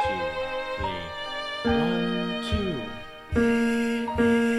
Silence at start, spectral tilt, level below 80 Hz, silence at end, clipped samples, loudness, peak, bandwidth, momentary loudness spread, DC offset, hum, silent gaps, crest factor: 0 s; -6 dB/octave; -42 dBFS; 0 s; under 0.1%; -26 LUFS; -12 dBFS; 12.5 kHz; 10 LU; under 0.1%; none; none; 14 dB